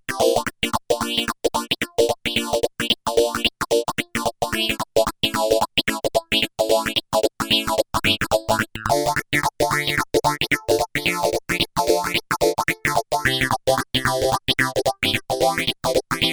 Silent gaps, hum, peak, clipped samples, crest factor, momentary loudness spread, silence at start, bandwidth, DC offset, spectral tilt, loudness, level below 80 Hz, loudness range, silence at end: none; none; -2 dBFS; under 0.1%; 20 dB; 4 LU; 0.1 s; over 20 kHz; under 0.1%; -3 dB/octave; -21 LUFS; -44 dBFS; 1 LU; 0 s